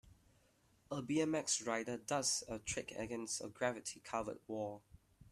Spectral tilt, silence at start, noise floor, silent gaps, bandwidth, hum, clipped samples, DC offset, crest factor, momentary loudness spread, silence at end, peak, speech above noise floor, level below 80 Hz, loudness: -3 dB/octave; 0.05 s; -73 dBFS; none; 14 kHz; none; under 0.1%; under 0.1%; 22 dB; 10 LU; 0.05 s; -20 dBFS; 32 dB; -70 dBFS; -40 LUFS